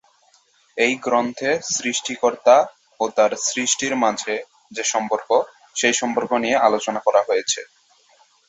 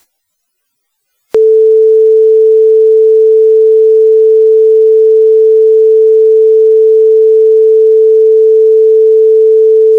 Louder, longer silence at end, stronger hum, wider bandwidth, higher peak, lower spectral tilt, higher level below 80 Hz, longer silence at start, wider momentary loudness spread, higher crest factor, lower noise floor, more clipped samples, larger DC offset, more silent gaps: second, -20 LUFS vs -6 LUFS; first, 0.85 s vs 0 s; neither; first, 8.4 kHz vs 1.1 kHz; about the same, -2 dBFS vs -2 dBFS; second, -1.5 dB/octave vs -5.5 dB/octave; about the same, -68 dBFS vs -66 dBFS; second, 0.75 s vs 1.35 s; first, 9 LU vs 0 LU; first, 20 dB vs 4 dB; second, -58 dBFS vs -67 dBFS; neither; neither; neither